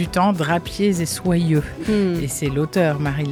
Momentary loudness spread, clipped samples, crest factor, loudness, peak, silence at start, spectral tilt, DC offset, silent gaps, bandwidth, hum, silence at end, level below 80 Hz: 4 LU; under 0.1%; 14 dB; -20 LUFS; -6 dBFS; 0 s; -6 dB/octave; under 0.1%; none; 16.5 kHz; none; 0 s; -40 dBFS